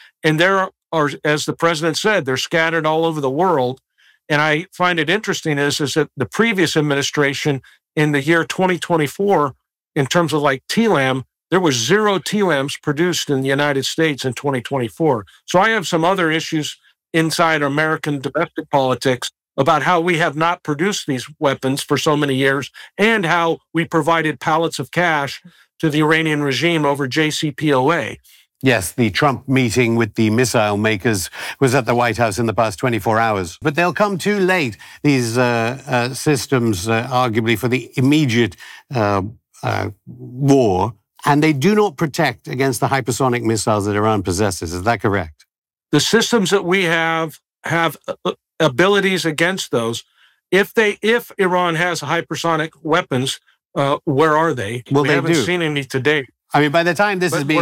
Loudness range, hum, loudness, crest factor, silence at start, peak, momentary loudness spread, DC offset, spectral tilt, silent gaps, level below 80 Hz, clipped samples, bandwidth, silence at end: 1 LU; none; -17 LUFS; 14 dB; 0.25 s; -4 dBFS; 7 LU; under 0.1%; -5 dB/octave; 45.58-45.62 s; -56 dBFS; under 0.1%; 17.5 kHz; 0 s